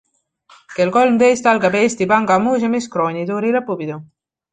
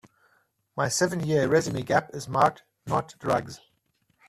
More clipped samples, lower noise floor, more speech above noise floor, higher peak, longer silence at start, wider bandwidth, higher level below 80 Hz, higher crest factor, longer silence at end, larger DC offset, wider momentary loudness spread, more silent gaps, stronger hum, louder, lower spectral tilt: neither; second, -53 dBFS vs -71 dBFS; second, 37 dB vs 45 dB; first, -2 dBFS vs -6 dBFS; about the same, 0.7 s vs 0.75 s; second, 9.4 kHz vs 14.5 kHz; about the same, -58 dBFS vs -60 dBFS; about the same, 16 dB vs 20 dB; second, 0.5 s vs 0.7 s; neither; second, 12 LU vs 15 LU; neither; neither; first, -16 LUFS vs -26 LUFS; about the same, -5.5 dB/octave vs -4.5 dB/octave